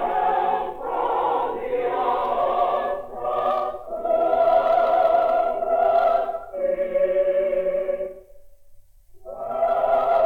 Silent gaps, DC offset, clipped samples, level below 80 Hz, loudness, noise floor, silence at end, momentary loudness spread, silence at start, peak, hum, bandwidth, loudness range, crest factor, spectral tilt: none; under 0.1%; under 0.1%; -52 dBFS; -22 LUFS; -47 dBFS; 0 s; 10 LU; 0 s; -8 dBFS; none; 5 kHz; 5 LU; 14 dB; -6 dB/octave